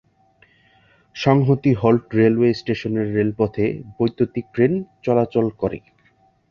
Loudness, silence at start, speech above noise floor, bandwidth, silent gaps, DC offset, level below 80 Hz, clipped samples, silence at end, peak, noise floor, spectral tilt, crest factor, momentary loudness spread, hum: -20 LUFS; 1.15 s; 40 dB; 7 kHz; none; under 0.1%; -52 dBFS; under 0.1%; 0.7 s; -2 dBFS; -59 dBFS; -8.5 dB/octave; 18 dB; 8 LU; none